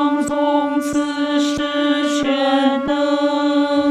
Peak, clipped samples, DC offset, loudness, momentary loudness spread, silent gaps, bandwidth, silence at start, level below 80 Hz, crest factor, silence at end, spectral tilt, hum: -4 dBFS; under 0.1%; under 0.1%; -18 LUFS; 3 LU; none; 12.5 kHz; 0 s; -52 dBFS; 12 dB; 0 s; -3.5 dB/octave; none